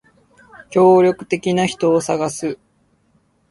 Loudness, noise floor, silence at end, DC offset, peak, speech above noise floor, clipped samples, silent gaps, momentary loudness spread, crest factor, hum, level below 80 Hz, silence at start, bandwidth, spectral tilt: -17 LUFS; -60 dBFS; 0.95 s; under 0.1%; -2 dBFS; 45 dB; under 0.1%; none; 14 LU; 18 dB; none; -58 dBFS; 0.7 s; 11.5 kHz; -5.5 dB/octave